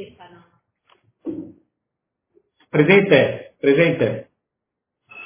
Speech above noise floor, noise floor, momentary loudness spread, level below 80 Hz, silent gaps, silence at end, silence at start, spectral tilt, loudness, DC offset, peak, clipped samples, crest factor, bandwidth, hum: 66 dB; -82 dBFS; 21 LU; -60 dBFS; none; 0 s; 0 s; -10 dB/octave; -17 LUFS; under 0.1%; 0 dBFS; under 0.1%; 22 dB; 3.6 kHz; none